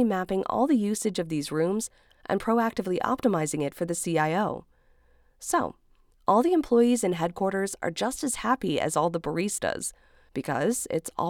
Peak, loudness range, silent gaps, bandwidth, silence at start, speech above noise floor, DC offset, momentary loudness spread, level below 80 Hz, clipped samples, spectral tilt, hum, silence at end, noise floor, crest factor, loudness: -8 dBFS; 3 LU; none; 18 kHz; 0 s; 34 dB; under 0.1%; 9 LU; -58 dBFS; under 0.1%; -5 dB/octave; none; 0 s; -61 dBFS; 18 dB; -27 LUFS